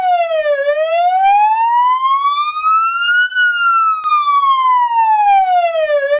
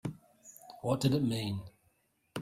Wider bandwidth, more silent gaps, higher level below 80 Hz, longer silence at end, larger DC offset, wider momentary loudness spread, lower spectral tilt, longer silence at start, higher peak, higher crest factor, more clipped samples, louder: second, 4 kHz vs 16 kHz; neither; about the same, -62 dBFS vs -64 dBFS; about the same, 0 s vs 0 s; neither; second, 4 LU vs 24 LU; second, -2 dB/octave vs -6.5 dB/octave; about the same, 0 s vs 0.05 s; first, -6 dBFS vs -16 dBFS; second, 8 dB vs 20 dB; neither; first, -12 LUFS vs -33 LUFS